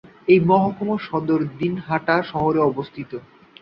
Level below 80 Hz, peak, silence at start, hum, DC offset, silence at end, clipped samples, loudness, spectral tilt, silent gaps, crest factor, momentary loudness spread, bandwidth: -54 dBFS; -2 dBFS; 0.25 s; none; under 0.1%; 0.4 s; under 0.1%; -20 LUFS; -9.5 dB/octave; none; 18 dB; 15 LU; 5.8 kHz